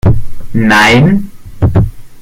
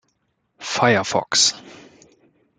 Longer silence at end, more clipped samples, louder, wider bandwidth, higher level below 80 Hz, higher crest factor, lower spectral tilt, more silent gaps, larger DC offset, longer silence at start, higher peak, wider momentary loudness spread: second, 0 s vs 0.85 s; neither; first, -10 LUFS vs -18 LUFS; first, 16 kHz vs 12 kHz; first, -22 dBFS vs -66 dBFS; second, 8 dB vs 22 dB; first, -6 dB/octave vs -2 dB/octave; neither; neither; second, 0.05 s vs 0.6 s; about the same, 0 dBFS vs 0 dBFS; second, 13 LU vs 17 LU